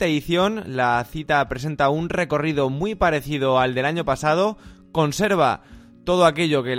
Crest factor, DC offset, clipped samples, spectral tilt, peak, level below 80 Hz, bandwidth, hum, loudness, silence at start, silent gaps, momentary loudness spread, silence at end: 18 dB; under 0.1%; under 0.1%; -5.5 dB/octave; -4 dBFS; -44 dBFS; 16.5 kHz; none; -21 LUFS; 0 s; none; 6 LU; 0 s